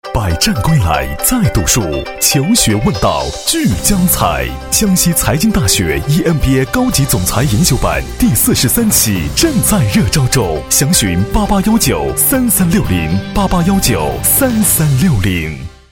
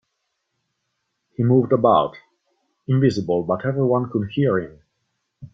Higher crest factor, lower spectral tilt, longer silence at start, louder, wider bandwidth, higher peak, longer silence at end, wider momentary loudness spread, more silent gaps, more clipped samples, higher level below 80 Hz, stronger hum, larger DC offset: second, 12 dB vs 18 dB; second, -4 dB/octave vs -8.5 dB/octave; second, 0.05 s vs 1.4 s; first, -12 LUFS vs -20 LUFS; first, over 20 kHz vs 7.6 kHz; first, 0 dBFS vs -4 dBFS; first, 0.25 s vs 0.05 s; second, 5 LU vs 11 LU; neither; neither; first, -24 dBFS vs -58 dBFS; neither; neither